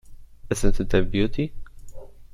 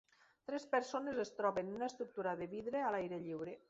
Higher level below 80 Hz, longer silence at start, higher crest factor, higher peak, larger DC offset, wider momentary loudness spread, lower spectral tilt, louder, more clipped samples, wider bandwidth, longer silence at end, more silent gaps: first, -30 dBFS vs -78 dBFS; second, 0.1 s vs 0.5 s; about the same, 18 dB vs 20 dB; first, -4 dBFS vs -22 dBFS; neither; about the same, 8 LU vs 7 LU; first, -6 dB/octave vs -4.5 dB/octave; first, -25 LUFS vs -41 LUFS; neither; first, 12 kHz vs 8 kHz; about the same, 0.1 s vs 0.1 s; neither